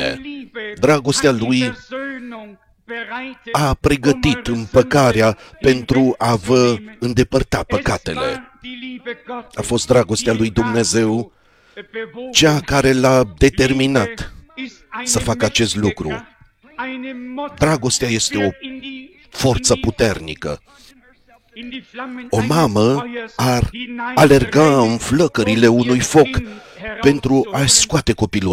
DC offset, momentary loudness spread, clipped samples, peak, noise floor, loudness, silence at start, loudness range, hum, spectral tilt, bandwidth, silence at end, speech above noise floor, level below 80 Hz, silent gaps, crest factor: under 0.1%; 17 LU; under 0.1%; 0 dBFS; -51 dBFS; -16 LUFS; 0 s; 6 LU; none; -4.5 dB/octave; 16.5 kHz; 0 s; 35 dB; -36 dBFS; none; 18 dB